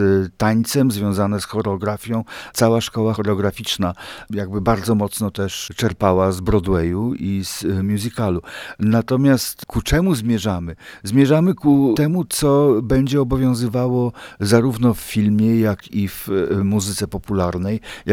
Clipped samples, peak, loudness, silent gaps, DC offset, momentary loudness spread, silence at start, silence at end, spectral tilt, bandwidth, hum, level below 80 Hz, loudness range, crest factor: under 0.1%; -2 dBFS; -19 LUFS; none; under 0.1%; 9 LU; 0 s; 0 s; -6 dB/octave; over 20 kHz; none; -38 dBFS; 4 LU; 16 dB